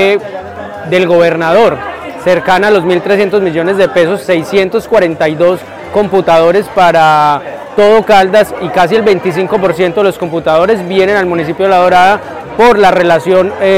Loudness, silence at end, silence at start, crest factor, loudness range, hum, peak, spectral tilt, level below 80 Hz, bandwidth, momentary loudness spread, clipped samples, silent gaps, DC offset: -9 LUFS; 0 s; 0 s; 8 dB; 2 LU; none; 0 dBFS; -5.5 dB/octave; -42 dBFS; 16 kHz; 9 LU; under 0.1%; none; 0.6%